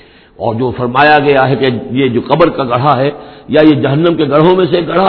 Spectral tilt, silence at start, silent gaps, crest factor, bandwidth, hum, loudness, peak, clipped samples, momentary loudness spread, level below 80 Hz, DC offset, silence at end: -9.5 dB/octave; 0.4 s; none; 10 dB; 5.4 kHz; none; -10 LUFS; 0 dBFS; 0.6%; 8 LU; -42 dBFS; under 0.1%; 0 s